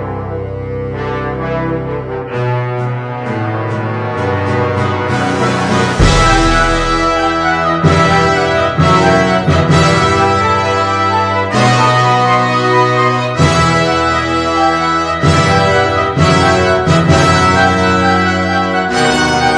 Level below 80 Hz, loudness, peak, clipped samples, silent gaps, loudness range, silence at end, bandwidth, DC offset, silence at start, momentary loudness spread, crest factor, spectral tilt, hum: -26 dBFS; -12 LUFS; 0 dBFS; under 0.1%; none; 7 LU; 0 s; 11 kHz; under 0.1%; 0 s; 9 LU; 12 dB; -5.5 dB/octave; none